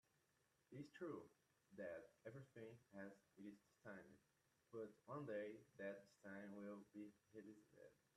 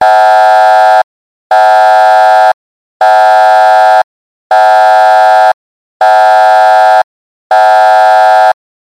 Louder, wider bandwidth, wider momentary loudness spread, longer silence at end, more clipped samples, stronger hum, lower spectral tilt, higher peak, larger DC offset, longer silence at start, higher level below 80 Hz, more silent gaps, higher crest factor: second, -58 LUFS vs -5 LUFS; about the same, 12.5 kHz vs 13 kHz; first, 10 LU vs 7 LU; second, 0.25 s vs 0.5 s; neither; neither; first, -7 dB/octave vs 1 dB/octave; second, -40 dBFS vs 0 dBFS; neither; first, 0.7 s vs 0 s; second, under -90 dBFS vs -74 dBFS; second, none vs 1.04-1.50 s, 2.54-3.00 s, 4.04-4.50 s, 5.54-6.00 s, 7.04-7.50 s; first, 18 dB vs 6 dB